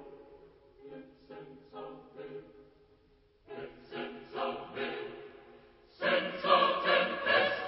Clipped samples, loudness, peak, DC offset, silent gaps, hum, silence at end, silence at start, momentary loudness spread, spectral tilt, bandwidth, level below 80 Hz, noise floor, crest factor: under 0.1%; -31 LUFS; -12 dBFS; under 0.1%; none; none; 0 s; 0 s; 24 LU; -7 dB/octave; 5.8 kHz; -70 dBFS; -66 dBFS; 22 dB